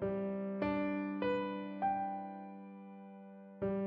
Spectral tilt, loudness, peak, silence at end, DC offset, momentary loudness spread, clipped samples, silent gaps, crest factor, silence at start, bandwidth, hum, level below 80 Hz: -6 dB/octave; -38 LUFS; -24 dBFS; 0 s; under 0.1%; 16 LU; under 0.1%; none; 14 dB; 0 s; 5.4 kHz; none; -68 dBFS